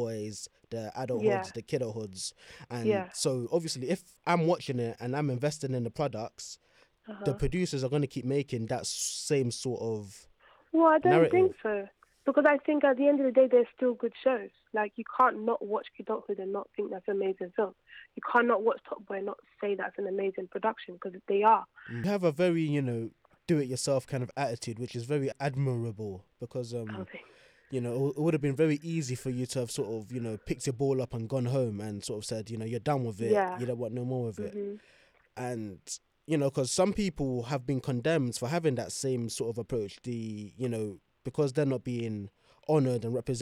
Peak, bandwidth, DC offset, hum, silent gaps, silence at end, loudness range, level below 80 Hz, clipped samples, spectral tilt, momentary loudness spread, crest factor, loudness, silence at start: -12 dBFS; 15 kHz; under 0.1%; none; none; 0 s; 7 LU; -58 dBFS; under 0.1%; -5.5 dB/octave; 15 LU; 20 dB; -31 LUFS; 0 s